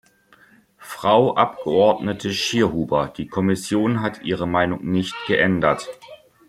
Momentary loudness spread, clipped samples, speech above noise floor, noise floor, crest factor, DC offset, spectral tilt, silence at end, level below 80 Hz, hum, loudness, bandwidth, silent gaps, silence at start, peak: 8 LU; under 0.1%; 34 dB; -54 dBFS; 18 dB; under 0.1%; -5.5 dB/octave; 0.35 s; -54 dBFS; none; -20 LUFS; 14.5 kHz; none; 0.8 s; -2 dBFS